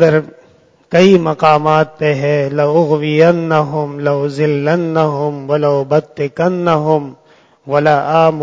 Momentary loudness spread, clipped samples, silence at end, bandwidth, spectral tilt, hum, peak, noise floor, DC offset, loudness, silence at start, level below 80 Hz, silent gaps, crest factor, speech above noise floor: 7 LU; 0.2%; 0 s; 8 kHz; -7.5 dB/octave; none; 0 dBFS; -48 dBFS; under 0.1%; -13 LUFS; 0 s; -56 dBFS; none; 12 dB; 36 dB